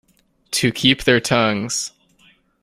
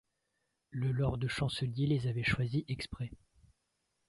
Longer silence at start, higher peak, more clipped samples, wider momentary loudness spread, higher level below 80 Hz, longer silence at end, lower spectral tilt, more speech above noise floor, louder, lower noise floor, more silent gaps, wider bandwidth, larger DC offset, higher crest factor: second, 0.5 s vs 0.7 s; first, 0 dBFS vs -18 dBFS; neither; about the same, 9 LU vs 10 LU; first, -48 dBFS vs -54 dBFS; second, 0.75 s vs 0.95 s; second, -3.5 dB/octave vs -6.5 dB/octave; second, 38 dB vs 49 dB; first, -18 LUFS vs -35 LUFS; second, -56 dBFS vs -82 dBFS; neither; first, 16 kHz vs 11.5 kHz; neither; about the same, 20 dB vs 18 dB